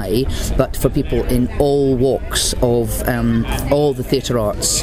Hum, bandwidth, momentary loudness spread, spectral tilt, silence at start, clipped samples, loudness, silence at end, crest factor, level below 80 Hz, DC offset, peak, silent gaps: none; 16 kHz; 4 LU; -5 dB/octave; 0 s; under 0.1%; -17 LUFS; 0 s; 16 dB; -26 dBFS; under 0.1%; 0 dBFS; none